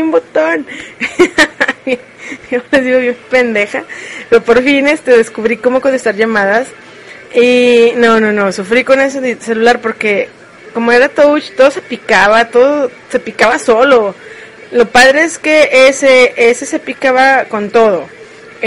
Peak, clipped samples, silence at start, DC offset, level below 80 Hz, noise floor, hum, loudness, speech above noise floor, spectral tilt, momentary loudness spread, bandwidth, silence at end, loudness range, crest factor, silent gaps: 0 dBFS; 0.5%; 0 s; under 0.1%; -48 dBFS; -33 dBFS; none; -10 LUFS; 23 dB; -3.5 dB/octave; 12 LU; 11.5 kHz; 0 s; 4 LU; 10 dB; none